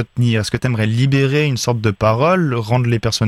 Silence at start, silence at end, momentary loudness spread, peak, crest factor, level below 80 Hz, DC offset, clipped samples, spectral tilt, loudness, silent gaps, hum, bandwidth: 0 s; 0 s; 3 LU; -2 dBFS; 14 dB; -44 dBFS; under 0.1%; under 0.1%; -6 dB/octave; -16 LUFS; none; none; 13.5 kHz